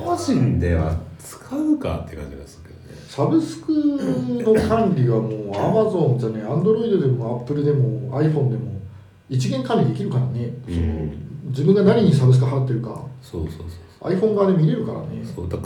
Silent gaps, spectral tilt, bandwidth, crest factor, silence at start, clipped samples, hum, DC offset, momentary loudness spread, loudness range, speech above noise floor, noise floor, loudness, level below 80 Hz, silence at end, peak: none; -8 dB/octave; 11.5 kHz; 16 dB; 0 s; under 0.1%; none; under 0.1%; 16 LU; 4 LU; 20 dB; -40 dBFS; -20 LUFS; -40 dBFS; 0 s; -4 dBFS